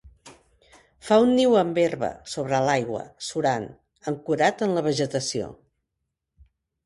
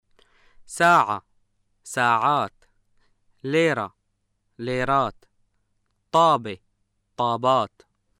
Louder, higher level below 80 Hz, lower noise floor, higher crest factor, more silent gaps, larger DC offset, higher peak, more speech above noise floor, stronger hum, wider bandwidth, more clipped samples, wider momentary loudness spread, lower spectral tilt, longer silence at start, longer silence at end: about the same, -24 LUFS vs -22 LUFS; about the same, -60 dBFS vs -58 dBFS; first, -81 dBFS vs -73 dBFS; about the same, 20 dB vs 18 dB; neither; neither; about the same, -6 dBFS vs -6 dBFS; first, 58 dB vs 51 dB; neither; second, 11.5 kHz vs 16 kHz; neither; second, 13 LU vs 17 LU; about the same, -5 dB/octave vs -4.5 dB/octave; second, 0.05 s vs 0.7 s; first, 1.3 s vs 0.5 s